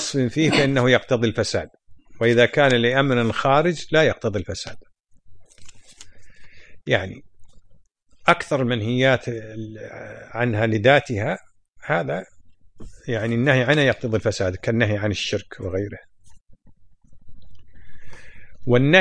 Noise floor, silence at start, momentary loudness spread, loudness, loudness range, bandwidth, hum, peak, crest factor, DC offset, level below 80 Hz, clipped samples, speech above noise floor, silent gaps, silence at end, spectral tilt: -50 dBFS; 0 s; 17 LU; -20 LUFS; 11 LU; 10.5 kHz; none; 0 dBFS; 22 dB; under 0.1%; -50 dBFS; under 0.1%; 30 dB; 16.41-16.45 s; 0 s; -5.5 dB/octave